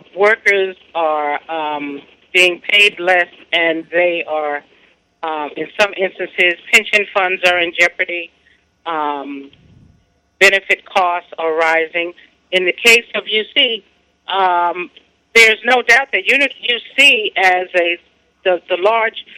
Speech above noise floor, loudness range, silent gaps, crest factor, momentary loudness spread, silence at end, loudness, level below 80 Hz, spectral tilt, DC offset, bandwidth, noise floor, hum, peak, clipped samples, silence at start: 40 dB; 6 LU; none; 16 dB; 15 LU; 0.15 s; -14 LUFS; -60 dBFS; -1.5 dB/octave; under 0.1%; 16 kHz; -56 dBFS; none; 0 dBFS; under 0.1%; 0.15 s